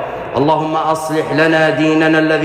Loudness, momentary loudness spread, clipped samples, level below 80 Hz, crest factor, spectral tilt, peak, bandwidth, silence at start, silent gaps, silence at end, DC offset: -14 LUFS; 5 LU; under 0.1%; -48 dBFS; 10 dB; -6 dB/octave; -2 dBFS; 15 kHz; 0 s; none; 0 s; under 0.1%